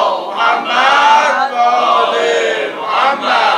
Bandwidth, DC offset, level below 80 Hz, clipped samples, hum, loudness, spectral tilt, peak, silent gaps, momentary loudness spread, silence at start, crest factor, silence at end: 11 kHz; under 0.1%; -68 dBFS; under 0.1%; none; -12 LUFS; -1.5 dB/octave; 0 dBFS; none; 7 LU; 0 s; 12 dB; 0 s